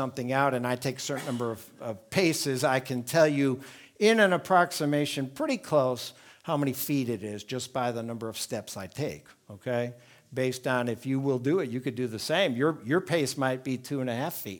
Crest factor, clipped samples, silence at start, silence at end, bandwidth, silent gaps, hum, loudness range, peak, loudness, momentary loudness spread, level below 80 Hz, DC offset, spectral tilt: 20 dB; under 0.1%; 0 s; 0 s; 19.5 kHz; none; none; 7 LU; -8 dBFS; -28 LUFS; 12 LU; -72 dBFS; under 0.1%; -5 dB/octave